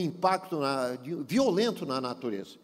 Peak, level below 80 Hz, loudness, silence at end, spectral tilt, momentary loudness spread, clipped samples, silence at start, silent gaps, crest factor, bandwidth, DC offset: -12 dBFS; -70 dBFS; -30 LUFS; 0.1 s; -5.5 dB/octave; 9 LU; under 0.1%; 0 s; none; 18 dB; 16 kHz; under 0.1%